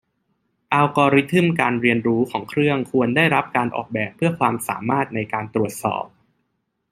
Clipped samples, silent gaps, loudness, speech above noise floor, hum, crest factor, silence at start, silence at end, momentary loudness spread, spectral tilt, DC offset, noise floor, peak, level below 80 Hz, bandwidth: under 0.1%; none; -20 LUFS; 53 dB; none; 18 dB; 0.7 s; 0.85 s; 8 LU; -6 dB/octave; under 0.1%; -73 dBFS; -2 dBFS; -60 dBFS; 16 kHz